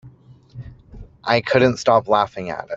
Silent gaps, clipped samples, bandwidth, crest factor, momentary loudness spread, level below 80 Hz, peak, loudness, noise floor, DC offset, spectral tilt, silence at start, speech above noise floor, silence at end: none; under 0.1%; 8 kHz; 18 dB; 24 LU; -48 dBFS; -2 dBFS; -18 LUFS; -46 dBFS; under 0.1%; -5.5 dB/octave; 0.05 s; 28 dB; 0 s